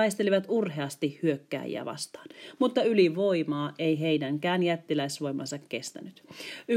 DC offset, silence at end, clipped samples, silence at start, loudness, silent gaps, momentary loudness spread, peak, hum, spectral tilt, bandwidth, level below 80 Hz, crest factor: under 0.1%; 0 s; under 0.1%; 0 s; -29 LUFS; none; 16 LU; -12 dBFS; none; -5.5 dB/octave; 16 kHz; -84 dBFS; 18 dB